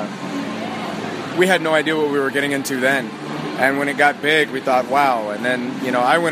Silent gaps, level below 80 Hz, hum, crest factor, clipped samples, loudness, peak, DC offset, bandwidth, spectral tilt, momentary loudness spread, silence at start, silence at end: none; -66 dBFS; none; 18 dB; under 0.1%; -19 LUFS; 0 dBFS; under 0.1%; 15.5 kHz; -4 dB/octave; 10 LU; 0 s; 0 s